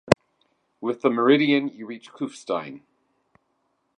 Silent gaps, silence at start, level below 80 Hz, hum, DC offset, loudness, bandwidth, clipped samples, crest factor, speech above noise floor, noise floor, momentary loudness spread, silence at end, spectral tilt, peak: none; 0.1 s; -56 dBFS; none; under 0.1%; -23 LUFS; 10.5 kHz; under 0.1%; 26 dB; 49 dB; -72 dBFS; 18 LU; 1.2 s; -6 dB/octave; 0 dBFS